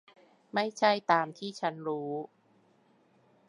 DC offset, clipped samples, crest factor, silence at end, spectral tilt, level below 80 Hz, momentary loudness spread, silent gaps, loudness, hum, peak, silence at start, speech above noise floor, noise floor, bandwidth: under 0.1%; under 0.1%; 22 dB; 1.25 s; -4.5 dB/octave; -88 dBFS; 11 LU; none; -31 LUFS; none; -10 dBFS; 0.55 s; 36 dB; -66 dBFS; 11.5 kHz